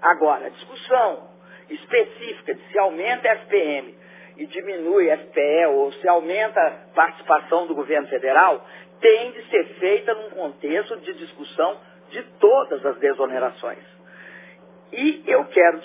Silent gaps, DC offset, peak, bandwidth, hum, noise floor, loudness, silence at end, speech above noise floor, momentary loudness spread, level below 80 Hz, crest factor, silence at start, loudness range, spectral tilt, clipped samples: none; under 0.1%; -2 dBFS; 3.9 kHz; none; -47 dBFS; -20 LUFS; 0 s; 27 dB; 18 LU; -84 dBFS; 18 dB; 0 s; 4 LU; -7.5 dB/octave; under 0.1%